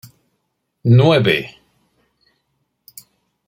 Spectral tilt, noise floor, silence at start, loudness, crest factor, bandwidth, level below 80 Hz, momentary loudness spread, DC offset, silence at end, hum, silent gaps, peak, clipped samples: -7.5 dB/octave; -72 dBFS; 0.85 s; -14 LUFS; 18 dB; 16.5 kHz; -56 dBFS; 14 LU; under 0.1%; 2 s; none; none; -2 dBFS; under 0.1%